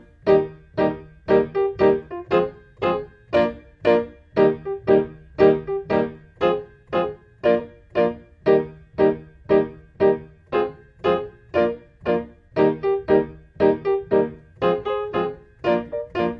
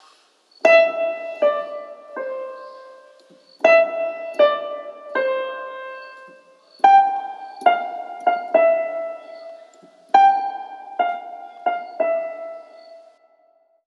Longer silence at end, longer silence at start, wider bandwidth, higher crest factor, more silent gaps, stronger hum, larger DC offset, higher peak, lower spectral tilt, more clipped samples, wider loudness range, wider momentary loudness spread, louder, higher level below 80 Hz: second, 0 s vs 0.9 s; second, 0.25 s vs 0.65 s; second, 5.6 kHz vs 7.2 kHz; about the same, 20 dB vs 20 dB; neither; neither; neither; about the same, -2 dBFS vs -2 dBFS; first, -8.5 dB/octave vs -2.5 dB/octave; neither; about the same, 2 LU vs 3 LU; second, 9 LU vs 21 LU; second, -22 LUFS vs -19 LUFS; first, -50 dBFS vs -86 dBFS